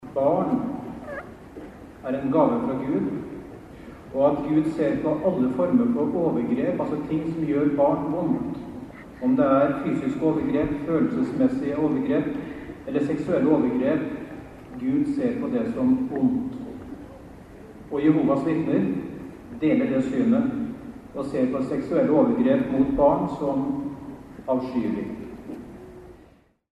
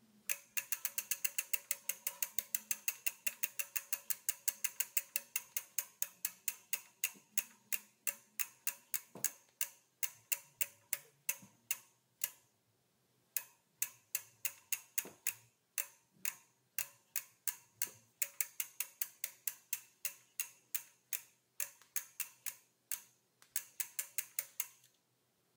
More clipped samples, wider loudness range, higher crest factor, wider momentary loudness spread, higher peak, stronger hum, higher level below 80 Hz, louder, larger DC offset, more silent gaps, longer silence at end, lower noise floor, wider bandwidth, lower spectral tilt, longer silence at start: neither; about the same, 3 LU vs 5 LU; second, 16 dB vs 30 dB; first, 18 LU vs 7 LU; first, -8 dBFS vs -14 dBFS; neither; first, -50 dBFS vs under -90 dBFS; first, -24 LUFS vs -40 LUFS; neither; neither; second, 0.65 s vs 0.85 s; second, -55 dBFS vs -78 dBFS; second, 8.6 kHz vs 19 kHz; first, -9 dB/octave vs 2 dB/octave; second, 0 s vs 0.3 s